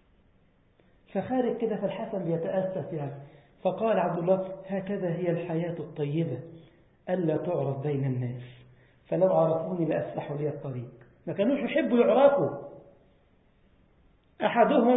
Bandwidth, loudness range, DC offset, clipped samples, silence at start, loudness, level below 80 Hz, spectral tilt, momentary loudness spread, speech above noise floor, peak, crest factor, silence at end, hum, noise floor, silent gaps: 4 kHz; 5 LU; under 0.1%; under 0.1%; 1.15 s; -28 LUFS; -66 dBFS; -11.5 dB/octave; 16 LU; 36 dB; -8 dBFS; 20 dB; 0 s; none; -63 dBFS; none